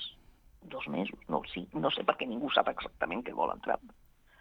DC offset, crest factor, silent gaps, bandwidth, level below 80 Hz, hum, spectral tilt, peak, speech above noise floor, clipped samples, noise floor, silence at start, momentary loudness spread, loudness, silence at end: under 0.1%; 26 dB; none; 19 kHz; -60 dBFS; none; -6.5 dB/octave; -8 dBFS; 26 dB; under 0.1%; -59 dBFS; 0 s; 9 LU; -34 LUFS; 0.5 s